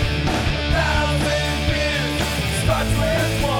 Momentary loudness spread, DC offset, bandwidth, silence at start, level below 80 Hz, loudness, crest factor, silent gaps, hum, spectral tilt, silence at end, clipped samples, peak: 2 LU; under 0.1%; 18.5 kHz; 0 s; -26 dBFS; -20 LUFS; 12 dB; none; none; -4.5 dB/octave; 0 s; under 0.1%; -8 dBFS